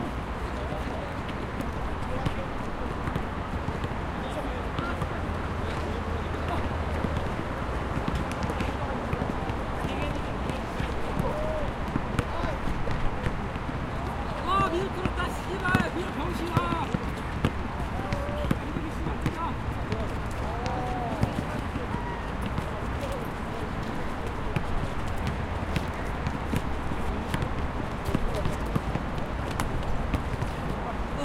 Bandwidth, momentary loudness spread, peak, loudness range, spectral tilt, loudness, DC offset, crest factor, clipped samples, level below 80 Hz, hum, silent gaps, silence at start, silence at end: 16 kHz; 4 LU; -4 dBFS; 3 LU; -6.5 dB/octave; -31 LUFS; under 0.1%; 24 dB; under 0.1%; -36 dBFS; none; none; 0 s; 0 s